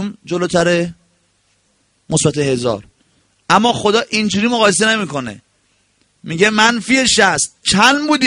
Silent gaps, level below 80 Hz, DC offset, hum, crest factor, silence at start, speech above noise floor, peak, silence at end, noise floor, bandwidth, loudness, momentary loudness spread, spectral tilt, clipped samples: none; -48 dBFS; under 0.1%; none; 16 dB; 0 s; 46 dB; 0 dBFS; 0 s; -60 dBFS; 11 kHz; -14 LUFS; 11 LU; -3 dB/octave; under 0.1%